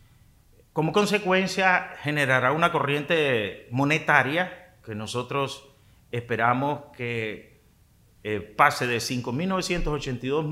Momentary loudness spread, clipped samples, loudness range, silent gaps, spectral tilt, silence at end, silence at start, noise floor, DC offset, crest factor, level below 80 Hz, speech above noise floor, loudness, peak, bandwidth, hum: 13 LU; under 0.1%; 7 LU; none; -5 dB/octave; 0 s; 0.75 s; -58 dBFS; under 0.1%; 24 dB; -46 dBFS; 34 dB; -25 LUFS; -2 dBFS; 16 kHz; none